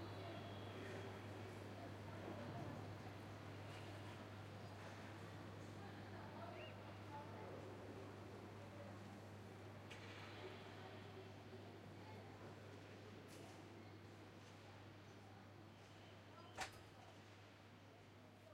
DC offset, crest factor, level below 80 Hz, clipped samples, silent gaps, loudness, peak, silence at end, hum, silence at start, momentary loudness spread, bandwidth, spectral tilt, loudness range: under 0.1%; 22 dB; -80 dBFS; under 0.1%; none; -56 LUFS; -34 dBFS; 0 s; none; 0 s; 9 LU; 16 kHz; -5.5 dB/octave; 5 LU